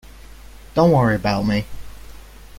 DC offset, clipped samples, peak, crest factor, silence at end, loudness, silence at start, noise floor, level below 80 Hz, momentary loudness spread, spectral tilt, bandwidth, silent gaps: under 0.1%; under 0.1%; -4 dBFS; 18 dB; 0.45 s; -18 LUFS; 0.15 s; -40 dBFS; -40 dBFS; 10 LU; -7.5 dB/octave; 16.5 kHz; none